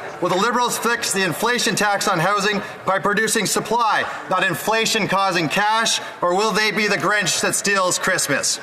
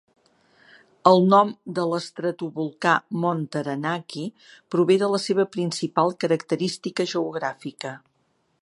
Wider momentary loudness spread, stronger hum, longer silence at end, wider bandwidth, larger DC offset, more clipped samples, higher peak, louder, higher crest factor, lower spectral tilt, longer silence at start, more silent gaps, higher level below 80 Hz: second, 3 LU vs 15 LU; neither; second, 0 s vs 0.65 s; first, 16 kHz vs 11.5 kHz; neither; neither; second, -4 dBFS vs 0 dBFS; first, -18 LUFS vs -23 LUFS; second, 14 dB vs 24 dB; second, -2.5 dB/octave vs -5.5 dB/octave; second, 0 s vs 1.05 s; neither; first, -58 dBFS vs -74 dBFS